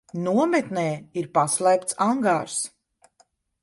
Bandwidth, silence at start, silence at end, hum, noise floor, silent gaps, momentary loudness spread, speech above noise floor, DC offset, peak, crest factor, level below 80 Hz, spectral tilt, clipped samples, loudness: 11.5 kHz; 0.15 s; 0.95 s; none; -64 dBFS; none; 8 LU; 41 dB; under 0.1%; -8 dBFS; 18 dB; -68 dBFS; -4.5 dB/octave; under 0.1%; -23 LUFS